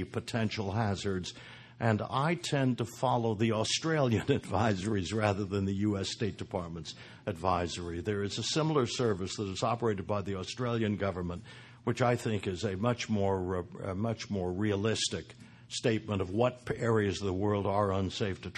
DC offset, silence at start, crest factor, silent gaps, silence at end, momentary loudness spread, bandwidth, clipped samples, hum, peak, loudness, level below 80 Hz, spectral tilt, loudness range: under 0.1%; 0 s; 20 dB; none; 0 s; 8 LU; 12.5 kHz; under 0.1%; none; -12 dBFS; -32 LUFS; -52 dBFS; -5.5 dB/octave; 3 LU